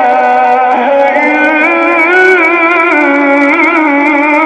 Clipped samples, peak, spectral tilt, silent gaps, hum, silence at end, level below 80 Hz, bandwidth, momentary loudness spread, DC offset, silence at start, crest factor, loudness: 0.5%; 0 dBFS; -4 dB/octave; none; none; 0 s; -56 dBFS; 9.8 kHz; 3 LU; under 0.1%; 0 s; 8 dB; -7 LUFS